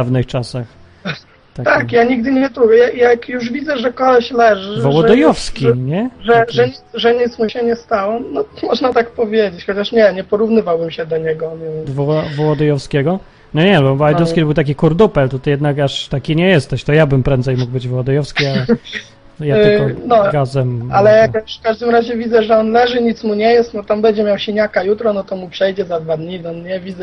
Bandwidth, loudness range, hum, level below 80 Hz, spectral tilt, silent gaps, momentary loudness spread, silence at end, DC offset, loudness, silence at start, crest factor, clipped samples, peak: 10.5 kHz; 3 LU; none; -38 dBFS; -7 dB/octave; none; 10 LU; 0 s; under 0.1%; -14 LUFS; 0 s; 14 dB; under 0.1%; 0 dBFS